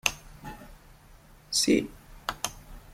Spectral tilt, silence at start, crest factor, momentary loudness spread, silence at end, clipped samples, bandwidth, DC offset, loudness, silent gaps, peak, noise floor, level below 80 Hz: -2.5 dB/octave; 0.05 s; 28 dB; 22 LU; 0 s; under 0.1%; 16.5 kHz; under 0.1%; -28 LUFS; none; -4 dBFS; -54 dBFS; -50 dBFS